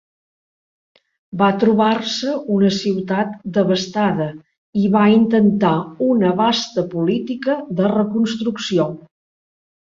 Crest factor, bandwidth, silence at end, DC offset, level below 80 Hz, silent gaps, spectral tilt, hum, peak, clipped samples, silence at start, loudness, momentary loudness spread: 16 dB; 7.6 kHz; 0.9 s; under 0.1%; -58 dBFS; 4.58-4.73 s; -6 dB/octave; none; -2 dBFS; under 0.1%; 1.35 s; -18 LUFS; 7 LU